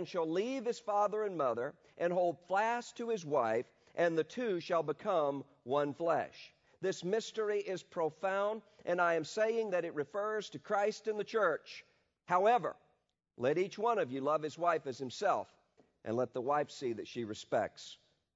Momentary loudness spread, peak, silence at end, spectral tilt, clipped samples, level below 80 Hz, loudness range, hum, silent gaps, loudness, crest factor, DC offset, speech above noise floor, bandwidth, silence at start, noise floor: 9 LU; -18 dBFS; 0.4 s; -3.5 dB/octave; under 0.1%; -84 dBFS; 2 LU; none; none; -35 LUFS; 18 dB; under 0.1%; 44 dB; 7.6 kHz; 0 s; -79 dBFS